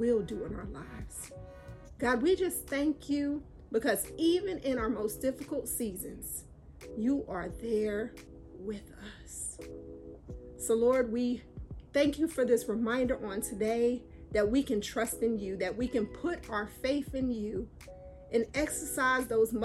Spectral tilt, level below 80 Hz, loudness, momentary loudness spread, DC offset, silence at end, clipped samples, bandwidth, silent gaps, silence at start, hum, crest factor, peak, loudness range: -4.5 dB/octave; -52 dBFS; -32 LUFS; 18 LU; under 0.1%; 0 s; under 0.1%; 16 kHz; none; 0 s; none; 18 dB; -16 dBFS; 6 LU